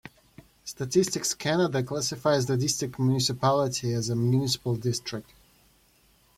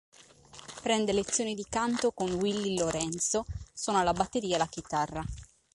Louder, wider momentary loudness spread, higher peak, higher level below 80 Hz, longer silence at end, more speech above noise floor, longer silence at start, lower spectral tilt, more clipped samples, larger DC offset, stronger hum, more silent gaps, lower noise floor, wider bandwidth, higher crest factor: first, -26 LUFS vs -30 LUFS; second, 9 LU vs 13 LU; about the same, -10 dBFS vs -12 dBFS; second, -60 dBFS vs -52 dBFS; first, 1.15 s vs 0.3 s; first, 36 dB vs 23 dB; second, 0.05 s vs 0.2 s; about the same, -4.5 dB/octave vs -3.5 dB/octave; neither; neither; neither; neither; first, -62 dBFS vs -53 dBFS; first, 16 kHz vs 11.5 kHz; about the same, 18 dB vs 20 dB